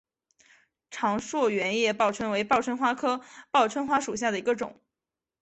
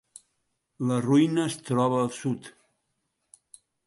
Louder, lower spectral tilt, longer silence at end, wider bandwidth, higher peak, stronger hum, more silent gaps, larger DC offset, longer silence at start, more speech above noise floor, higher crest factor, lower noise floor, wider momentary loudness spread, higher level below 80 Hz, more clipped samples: about the same, -27 LUFS vs -26 LUFS; second, -3.5 dB/octave vs -6.5 dB/octave; second, 0.7 s vs 1.35 s; second, 8.4 kHz vs 11.5 kHz; about the same, -10 dBFS vs -10 dBFS; neither; neither; neither; about the same, 0.9 s vs 0.8 s; first, 63 dB vs 53 dB; about the same, 18 dB vs 18 dB; first, -90 dBFS vs -78 dBFS; second, 6 LU vs 10 LU; about the same, -66 dBFS vs -70 dBFS; neither